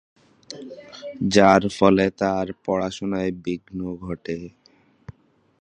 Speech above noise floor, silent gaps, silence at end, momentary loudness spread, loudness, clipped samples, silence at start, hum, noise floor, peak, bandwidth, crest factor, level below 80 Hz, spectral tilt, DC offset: 37 dB; none; 1.1 s; 21 LU; -22 LUFS; under 0.1%; 0.5 s; none; -59 dBFS; 0 dBFS; 10 kHz; 22 dB; -52 dBFS; -5.5 dB/octave; under 0.1%